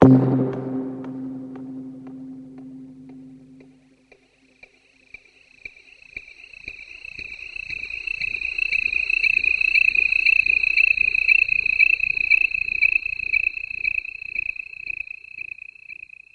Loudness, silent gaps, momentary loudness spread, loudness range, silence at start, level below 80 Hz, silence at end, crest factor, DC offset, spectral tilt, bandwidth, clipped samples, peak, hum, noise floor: -18 LUFS; none; 23 LU; 22 LU; 0 s; -52 dBFS; 0.4 s; 22 dB; under 0.1%; -7 dB/octave; 8.6 kHz; under 0.1%; 0 dBFS; none; -58 dBFS